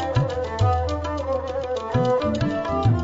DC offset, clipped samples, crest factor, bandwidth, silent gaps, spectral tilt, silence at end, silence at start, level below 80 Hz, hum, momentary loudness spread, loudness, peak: under 0.1%; under 0.1%; 14 dB; 7.8 kHz; none; -7.5 dB/octave; 0 s; 0 s; -36 dBFS; none; 5 LU; -23 LUFS; -8 dBFS